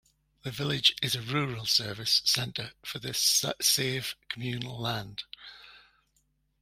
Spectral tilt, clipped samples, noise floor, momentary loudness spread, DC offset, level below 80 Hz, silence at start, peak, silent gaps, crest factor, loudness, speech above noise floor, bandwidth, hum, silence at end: -2 dB/octave; under 0.1%; -73 dBFS; 16 LU; under 0.1%; -62 dBFS; 0.45 s; -8 dBFS; none; 24 dB; -27 LUFS; 43 dB; 16 kHz; none; 0.85 s